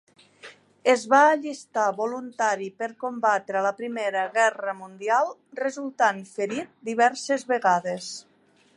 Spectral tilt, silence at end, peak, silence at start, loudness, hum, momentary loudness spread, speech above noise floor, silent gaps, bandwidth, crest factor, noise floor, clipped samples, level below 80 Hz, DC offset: -3.5 dB/octave; 0.55 s; -6 dBFS; 0.45 s; -25 LUFS; none; 12 LU; 25 dB; none; 11.5 kHz; 20 dB; -49 dBFS; under 0.1%; -82 dBFS; under 0.1%